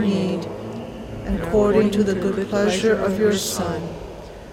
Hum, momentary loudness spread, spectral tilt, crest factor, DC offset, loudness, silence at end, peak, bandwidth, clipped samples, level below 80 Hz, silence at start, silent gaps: none; 15 LU; -5.5 dB/octave; 16 dB; under 0.1%; -21 LUFS; 0 s; -6 dBFS; 16.5 kHz; under 0.1%; -40 dBFS; 0 s; none